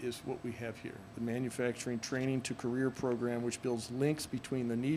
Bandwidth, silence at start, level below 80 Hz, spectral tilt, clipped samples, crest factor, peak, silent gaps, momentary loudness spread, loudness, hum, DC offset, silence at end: 15.5 kHz; 0 s; -66 dBFS; -5.5 dB/octave; under 0.1%; 16 dB; -20 dBFS; none; 7 LU; -37 LUFS; none; under 0.1%; 0 s